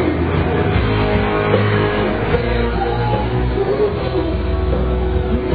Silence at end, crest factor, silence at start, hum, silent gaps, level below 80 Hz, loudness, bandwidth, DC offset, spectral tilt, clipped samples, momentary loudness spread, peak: 0 s; 16 dB; 0 s; none; none; -24 dBFS; -17 LUFS; 4.9 kHz; 0.7%; -10.5 dB/octave; under 0.1%; 3 LU; 0 dBFS